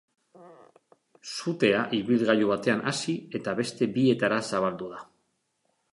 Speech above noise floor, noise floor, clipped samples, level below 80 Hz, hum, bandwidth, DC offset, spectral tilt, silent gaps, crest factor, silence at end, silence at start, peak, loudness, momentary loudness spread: 48 dB; -75 dBFS; under 0.1%; -70 dBFS; none; 11.5 kHz; under 0.1%; -5 dB/octave; none; 20 dB; 0.9 s; 0.4 s; -8 dBFS; -26 LUFS; 14 LU